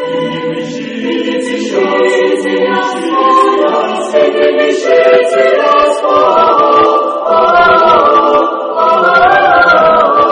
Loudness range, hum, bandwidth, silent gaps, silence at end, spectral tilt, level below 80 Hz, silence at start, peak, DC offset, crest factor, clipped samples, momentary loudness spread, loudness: 4 LU; none; 10.5 kHz; none; 0 s; -4.5 dB/octave; -46 dBFS; 0 s; 0 dBFS; under 0.1%; 8 dB; 0.1%; 9 LU; -9 LUFS